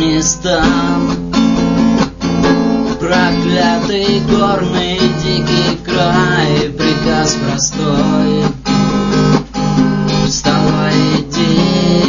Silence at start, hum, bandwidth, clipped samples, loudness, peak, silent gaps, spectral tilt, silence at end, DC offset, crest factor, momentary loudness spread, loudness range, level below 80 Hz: 0 s; none; 7.4 kHz; under 0.1%; -13 LUFS; 0 dBFS; none; -5 dB/octave; 0 s; 0.2%; 12 dB; 3 LU; 1 LU; -32 dBFS